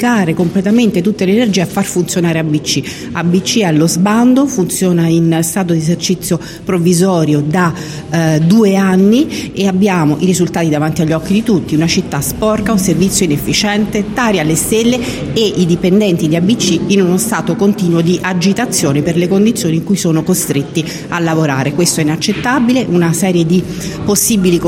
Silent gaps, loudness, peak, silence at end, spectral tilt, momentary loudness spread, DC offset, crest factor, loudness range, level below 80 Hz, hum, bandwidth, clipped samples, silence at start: none; -12 LUFS; 0 dBFS; 0 s; -5 dB/octave; 5 LU; under 0.1%; 12 dB; 2 LU; -40 dBFS; none; 16.5 kHz; under 0.1%; 0 s